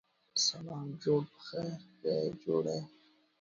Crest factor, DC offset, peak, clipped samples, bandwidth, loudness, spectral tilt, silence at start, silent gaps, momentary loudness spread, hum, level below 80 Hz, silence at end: 18 dB; under 0.1%; -18 dBFS; under 0.1%; 7.6 kHz; -35 LUFS; -4 dB/octave; 0.35 s; none; 11 LU; none; -74 dBFS; 0.55 s